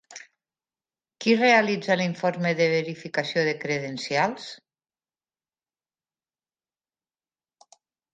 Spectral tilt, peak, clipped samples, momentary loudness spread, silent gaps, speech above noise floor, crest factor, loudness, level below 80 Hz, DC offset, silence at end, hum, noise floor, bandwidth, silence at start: -5 dB/octave; -6 dBFS; under 0.1%; 13 LU; none; over 66 dB; 22 dB; -24 LUFS; -76 dBFS; under 0.1%; 3.55 s; none; under -90 dBFS; 9.2 kHz; 0.1 s